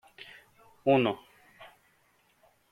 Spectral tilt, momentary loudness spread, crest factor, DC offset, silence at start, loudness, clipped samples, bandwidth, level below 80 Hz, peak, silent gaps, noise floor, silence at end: -7.5 dB/octave; 27 LU; 22 dB; under 0.1%; 0.85 s; -28 LUFS; under 0.1%; 14.5 kHz; -74 dBFS; -12 dBFS; none; -68 dBFS; 1.05 s